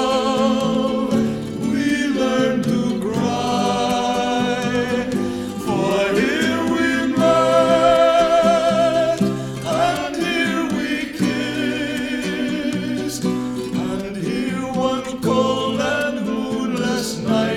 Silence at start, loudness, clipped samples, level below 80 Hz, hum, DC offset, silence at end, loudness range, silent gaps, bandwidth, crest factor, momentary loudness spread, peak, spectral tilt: 0 s; -19 LUFS; under 0.1%; -48 dBFS; none; under 0.1%; 0 s; 6 LU; none; 16 kHz; 16 dB; 8 LU; -4 dBFS; -5 dB/octave